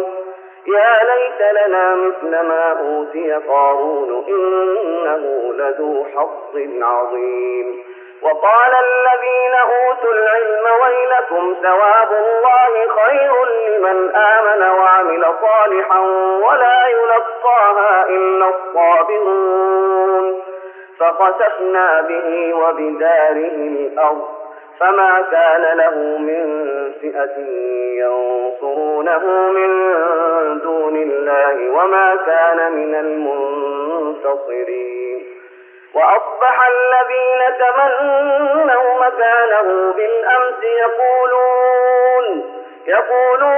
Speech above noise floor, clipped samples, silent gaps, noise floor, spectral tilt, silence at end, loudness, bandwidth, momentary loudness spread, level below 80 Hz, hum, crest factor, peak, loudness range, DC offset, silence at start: 28 dB; under 0.1%; none; -41 dBFS; 2 dB/octave; 0 s; -14 LUFS; 3.5 kHz; 10 LU; -88 dBFS; none; 12 dB; -2 dBFS; 6 LU; under 0.1%; 0 s